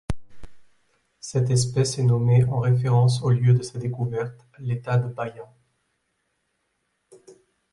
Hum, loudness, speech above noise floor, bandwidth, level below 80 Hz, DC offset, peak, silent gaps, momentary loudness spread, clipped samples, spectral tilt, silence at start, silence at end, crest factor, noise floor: none; -22 LUFS; 52 dB; 11.5 kHz; -50 dBFS; under 0.1%; -8 dBFS; none; 15 LU; under 0.1%; -6.5 dB/octave; 0.1 s; 0.4 s; 16 dB; -74 dBFS